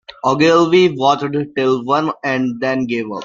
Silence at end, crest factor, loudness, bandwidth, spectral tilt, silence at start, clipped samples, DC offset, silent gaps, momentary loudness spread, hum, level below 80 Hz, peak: 0 s; 14 dB; -15 LUFS; 7.4 kHz; -5.5 dB/octave; 0.1 s; under 0.1%; under 0.1%; none; 8 LU; none; -58 dBFS; 0 dBFS